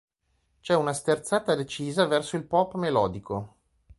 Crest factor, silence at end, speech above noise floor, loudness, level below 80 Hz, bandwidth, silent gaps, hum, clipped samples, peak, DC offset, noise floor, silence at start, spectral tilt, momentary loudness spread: 20 dB; 0.5 s; 46 dB; -26 LUFS; -58 dBFS; 11.5 kHz; none; none; under 0.1%; -8 dBFS; under 0.1%; -72 dBFS; 0.65 s; -5 dB/octave; 10 LU